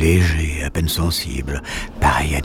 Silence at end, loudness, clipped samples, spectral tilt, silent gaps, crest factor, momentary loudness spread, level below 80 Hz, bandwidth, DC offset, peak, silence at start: 0 s; -20 LUFS; under 0.1%; -5 dB/octave; none; 16 dB; 9 LU; -26 dBFS; 18 kHz; under 0.1%; -2 dBFS; 0 s